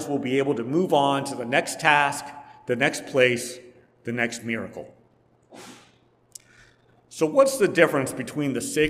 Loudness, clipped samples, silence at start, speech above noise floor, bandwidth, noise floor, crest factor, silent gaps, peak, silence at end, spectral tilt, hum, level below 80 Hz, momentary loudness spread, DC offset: -23 LUFS; under 0.1%; 0 s; 38 dB; 16 kHz; -61 dBFS; 22 dB; none; -2 dBFS; 0 s; -4 dB/octave; none; -64 dBFS; 20 LU; under 0.1%